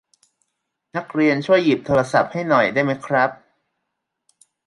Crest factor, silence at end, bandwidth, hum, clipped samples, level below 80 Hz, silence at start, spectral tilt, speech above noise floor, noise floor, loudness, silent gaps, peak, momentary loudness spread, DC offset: 18 dB; 1.3 s; 11.5 kHz; none; under 0.1%; -56 dBFS; 0.95 s; -6.5 dB/octave; 60 dB; -78 dBFS; -19 LUFS; none; -2 dBFS; 8 LU; under 0.1%